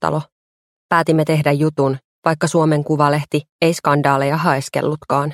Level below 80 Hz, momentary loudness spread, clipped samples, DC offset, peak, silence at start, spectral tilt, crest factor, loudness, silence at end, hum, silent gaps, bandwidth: -56 dBFS; 6 LU; under 0.1%; under 0.1%; 0 dBFS; 0 s; -6 dB/octave; 18 dB; -17 LUFS; 0 s; none; 0.32-0.89 s, 2.04-2.22 s, 3.49-3.59 s; 15 kHz